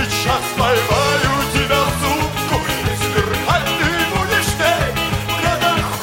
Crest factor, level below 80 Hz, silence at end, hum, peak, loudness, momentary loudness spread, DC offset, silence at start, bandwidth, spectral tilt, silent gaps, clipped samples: 16 dB; -32 dBFS; 0 s; none; -2 dBFS; -17 LUFS; 4 LU; under 0.1%; 0 s; 17 kHz; -4 dB/octave; none; under 0.1%